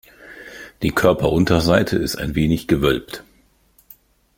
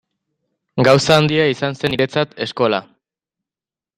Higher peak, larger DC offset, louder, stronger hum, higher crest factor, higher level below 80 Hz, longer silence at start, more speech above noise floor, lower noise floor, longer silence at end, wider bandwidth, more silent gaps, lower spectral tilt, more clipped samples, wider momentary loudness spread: about the same, -2 dBFS vs 0 dBFS; neither; about the same, -18 LUFS vs -16 LUFS; neither; about the same, 18 dB vs 18 dB; first, -38 dBFS vs -52 dBFS; second, 0.2 s vs 0.75 s; second, 39 dB vs over 74 dB; second, -57 dBFS vs under -90 dBFS; about the same, 1.15 s vs 1.15 s; about the same, 16.5 kHz vs 15 kHz; neither; about the same, -6 dB/octave vs -5 dB/octave; neither; first, 20 LU vs 10 LU